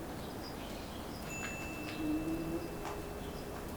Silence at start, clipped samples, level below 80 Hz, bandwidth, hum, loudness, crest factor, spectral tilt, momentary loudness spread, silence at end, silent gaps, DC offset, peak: 0 s; under 0.1%; -52 dBFS; over 20 kHz; none; -41 LUFS; 14 dB; -5 dB/octave; 7 LU; 0 s; none; under 0.1%; -26 dBFS